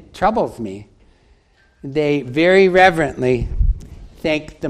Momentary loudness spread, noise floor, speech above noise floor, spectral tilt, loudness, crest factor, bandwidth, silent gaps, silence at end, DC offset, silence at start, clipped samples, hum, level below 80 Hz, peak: 18 LU; -54 dBFS; 38 dB; -6.5 dB/octave; -16 LUFS; 18 dB; 12 kHz; none; 0 s; under 0.1%; 0.15 s; under 0.1%; none; -28 dBFS; 0 dBFS